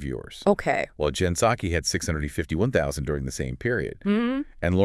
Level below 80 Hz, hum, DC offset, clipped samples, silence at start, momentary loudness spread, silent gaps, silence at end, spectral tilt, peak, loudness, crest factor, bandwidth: -42 dBFS; none; under 0.1%; under 0.1%; 0 s; 6 LU; none; 0 s; -5 dB/octave; -6 dBFS; -26 LUFS; 18 dB; 12 kHz